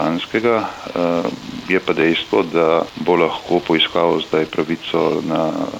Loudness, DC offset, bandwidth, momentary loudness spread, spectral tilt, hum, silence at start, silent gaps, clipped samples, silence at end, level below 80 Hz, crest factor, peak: -18 LUFS; under 0.1%; 16 kHz; 6 LU; -5.5 dB/octave; none; 0 s; none; under 0.1%; 0 s; -54 dBFS; 14 dB; -4 dBFS